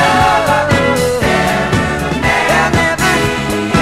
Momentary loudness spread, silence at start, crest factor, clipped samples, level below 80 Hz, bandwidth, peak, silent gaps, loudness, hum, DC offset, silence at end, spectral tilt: 4 LU; 0 s; 12 dB; under 0.1%; -30 dBFS; 16 kHz; 0 dBFS; none; -12 LUFS; none; under 0.1%; 0 s; -4.5 dB/octave